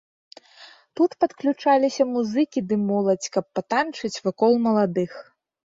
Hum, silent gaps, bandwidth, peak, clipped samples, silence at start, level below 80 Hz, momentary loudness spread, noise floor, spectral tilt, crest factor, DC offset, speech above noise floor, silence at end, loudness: none; none; 7.8 kHz; -8 dBFS; under 0.1%; 0.6 s; -68 dBFS; 8 LU; -50 dBFS; -5.5 dB/octave; 16 dB; under 0.1%; 28 dB; 0.55 s; -23 LUFS